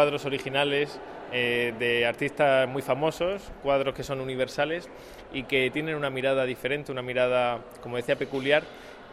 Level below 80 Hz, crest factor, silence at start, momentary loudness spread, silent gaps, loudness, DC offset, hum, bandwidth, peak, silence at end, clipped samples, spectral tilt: -56 dBFS; 20 dB; 0 s; 10 LU; none; -27 LUFS; under 0.1%; none; 15 kHz; -6 dBFS; 0 s; under 0.1%; -5 dB/octave